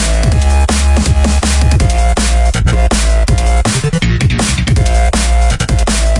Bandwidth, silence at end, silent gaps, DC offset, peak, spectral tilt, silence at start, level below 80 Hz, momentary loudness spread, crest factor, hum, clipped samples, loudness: 11.5 kHz; 0 s; none; under 0.1%; 0 dBFS; -4.5 dB/octave; 0 s; -12 dBFS; 2 LU; 10 dB; none; under 0.1%; -12 LUFS